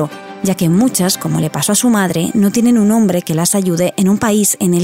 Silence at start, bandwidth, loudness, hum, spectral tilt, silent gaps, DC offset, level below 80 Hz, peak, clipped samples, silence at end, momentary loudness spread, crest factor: 0 s; 16.5 kHz; -13 LUFS; none; -5 dB/octave; none; 0.1%; -50 dBFS; -2 dBFS; under 0.1%; 0 s; 4 LU; 12 dB